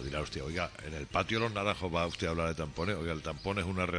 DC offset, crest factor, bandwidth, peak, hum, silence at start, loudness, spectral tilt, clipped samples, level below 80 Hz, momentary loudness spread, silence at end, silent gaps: under 0.1%; 20 dB; 10.5 kHz; -14 dBFS; none; 0 s; -34 LUFS; -5.5 dB/octave; under 0.1%; -48 dBFS; 5 LU; 0 s; none